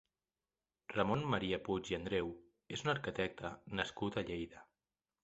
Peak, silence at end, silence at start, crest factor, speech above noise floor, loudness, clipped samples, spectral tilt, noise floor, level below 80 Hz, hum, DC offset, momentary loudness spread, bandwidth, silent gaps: -16 dBFS; 0.6 s; 0.9 s; 24 dB; over 51 dB; -40 LUFS; under 0.1%; -4 dB/octave; under -90 dBFS; -62 dBFS; none; under 0.1%; 11 LU; 8 kHz; none